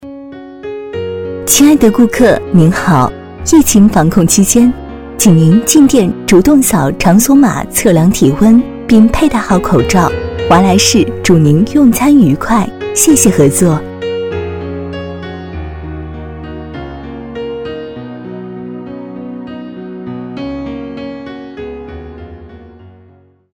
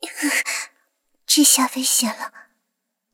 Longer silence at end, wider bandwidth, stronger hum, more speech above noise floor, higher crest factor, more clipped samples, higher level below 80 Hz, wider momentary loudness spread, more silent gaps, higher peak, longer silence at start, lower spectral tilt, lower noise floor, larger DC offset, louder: about the same, 0.65 s vs 0.75 s; first, 19 kHz vs 17 kHz; neither; second, 37 dB vs 59 dB; second, 10 dB vs 20 dB; first, 0.4% vs under 0.1%; first, -30 dBFS vs -78 dBFS; about the same, 19 LU vs 19 LU; neither; about the same, 0 dBFS vs -2 dBFS; about the same, 0 s vs 0 s; first, -5 dB/octave vs 0.5 dB/octave; second, -45 dBFS vs -77 dBFS; neither; first, -9 LUFS vs -17 LUFS